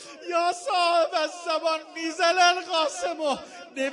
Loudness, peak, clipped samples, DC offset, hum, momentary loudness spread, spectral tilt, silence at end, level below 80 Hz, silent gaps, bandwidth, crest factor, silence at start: -25 LUFS; -6 dBFS; under 0.1%; under 0.1%; none; 10 LU; -0.5 dB/octave; 0 s; -76 dBFS; none; 11 kHz; 20 dB; 0 s